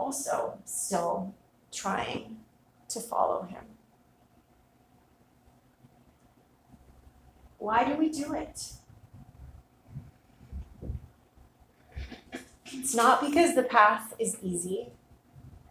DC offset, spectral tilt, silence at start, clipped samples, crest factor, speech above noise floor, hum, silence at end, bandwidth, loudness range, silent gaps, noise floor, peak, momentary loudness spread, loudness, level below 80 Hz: under 0.1%; -3.5 dB/octave; 0 s; under 0.1%; 26 dB; 35 dB; none; 0.15 s; 16 kHz; 20 LU; none; -64 dBFS; -6 dBFS; 25 LU; -28 LUFS; -54 dBFS